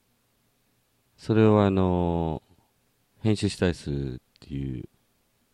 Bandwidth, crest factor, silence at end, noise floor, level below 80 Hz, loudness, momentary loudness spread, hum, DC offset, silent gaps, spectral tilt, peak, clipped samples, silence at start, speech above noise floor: 11.5 kHz; 20 dB; 0.7 s; -69 dBFS; -48 dBFS; -25 LUFS; 19 LU; none; under 0.1%; none; -7.5 dB/octave; -8 dBFS; under 0.1%; 1.2 s; 45 dB